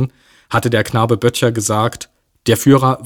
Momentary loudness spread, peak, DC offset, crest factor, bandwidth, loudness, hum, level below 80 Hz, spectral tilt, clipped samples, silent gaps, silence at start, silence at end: 12 LU; 0 dBFS; under 0.1%; 14 dB; 18.5 kHz; -15 LUFS; none; -48 dBFS; -5.5 dB/octave; under 0.1%; none; 0 s; 0 s